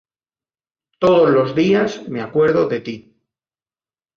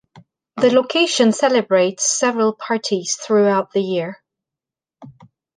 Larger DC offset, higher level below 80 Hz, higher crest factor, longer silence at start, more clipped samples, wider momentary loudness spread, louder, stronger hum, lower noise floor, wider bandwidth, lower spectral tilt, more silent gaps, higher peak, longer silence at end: neither; first, -58 dBFS vs -68 dBFS; about the same, 16 dB vs 16 dB; first, 1 s vs 0.15 s; neither; first, 13 LU vs 8 LU; about the same, -16 LUFS vs -17 LUFS; neither; about the same, under -90 dBFS vs -88 dBFS; second, 7.2 kHz vs 10.5 kHz; first, -7 dB/octave vs -3 dB/octave; neither; about the same, -2 dBFS vs -2 dBFS; first, 1.15 s vs 0.45 s